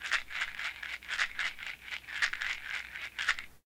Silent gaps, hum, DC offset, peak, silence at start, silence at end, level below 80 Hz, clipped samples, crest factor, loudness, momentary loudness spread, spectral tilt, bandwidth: none; none; under 0.1%; -14 dBFS; 0 s; 0.1 s; -60 dBFS; under 0.1%; 24 dB; -35 LUFS; 8 LU; 1 dB/octave; 18 kHz